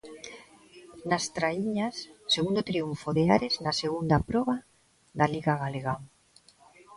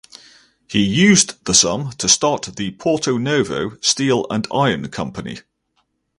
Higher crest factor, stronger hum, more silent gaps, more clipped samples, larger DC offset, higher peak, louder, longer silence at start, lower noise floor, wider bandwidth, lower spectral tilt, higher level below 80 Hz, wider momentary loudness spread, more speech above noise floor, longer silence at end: about the same, 20 dB vs 18 dB; neither; neither; neither; neither; second, -8 dBFS vs 0 dBFS; second, -28 LUFS vs -17 LUFS; second, 0.05 s vs 0.7 s; second, -60 dBFS vs -67 dBFS; about the same, 11.5 kHz vs 11.5 kHz; first, -5 dB/octave vs -3 dB/octave; about the same, -54 dBFS vs -50 dBFS; about the same, 15 LU vs 14 LU; second, 33 dB vs 50 dB; second, 0 s vs 0.8 s